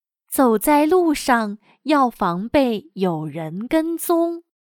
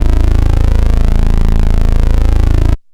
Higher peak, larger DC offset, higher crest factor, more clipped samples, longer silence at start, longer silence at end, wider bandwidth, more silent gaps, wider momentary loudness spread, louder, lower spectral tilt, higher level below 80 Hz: second, -4 dBFS vs 0 dBFS; neither; first, 16 dB vs 8 dB; second, under 0.1% vs 0.9%; first, 0.3 s vs 0 s; about the same, 0.2 s vs 0.15 s; first, 19 kHz vs 8 kHz; neither; first, 11 LU vs 1 LU; second, -20 LUFS vs -14 LUFS; second, -5 dB/octave vs -7.5 dB/octave; second, -50 dBFS vs -8 dBFS